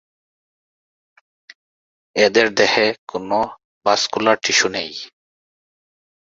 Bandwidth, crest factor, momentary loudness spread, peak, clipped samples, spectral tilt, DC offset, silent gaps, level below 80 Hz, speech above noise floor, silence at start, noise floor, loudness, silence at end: 7.8 kHz; 20 dB; 13 LU; 0 dBFS; under 0.1%; -2 dB/octave; under 0.1%; 2.98-3.07 s, 3.64-3.81 s; -62 dBFS; over 72 dB; 2.15 s; under -90 dBFS; -17 LUFS; 1.2 s